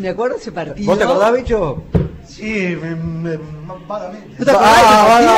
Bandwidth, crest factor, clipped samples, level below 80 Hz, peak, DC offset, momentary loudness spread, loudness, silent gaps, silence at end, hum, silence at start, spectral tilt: 16 kHz; 12 dB; under 0.1%; -34 dBFS; -2 dBFS; under 0.1%; 19 LU; -14 LUFS; none; 0 s; none; 0 s; -5 dB/octave